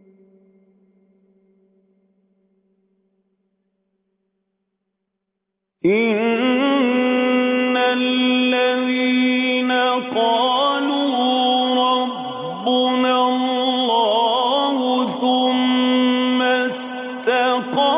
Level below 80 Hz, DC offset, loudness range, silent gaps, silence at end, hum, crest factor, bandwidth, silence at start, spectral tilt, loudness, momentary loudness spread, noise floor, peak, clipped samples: -74 dBFS; under 0.1%; 4 LU; none; 0 s; none; 14 dB; 4 kHz; 5.85 s; -8 dB/octave; -18 LUFS; 4 LU; -79 dBFS; -6 dBFS; under 0.1%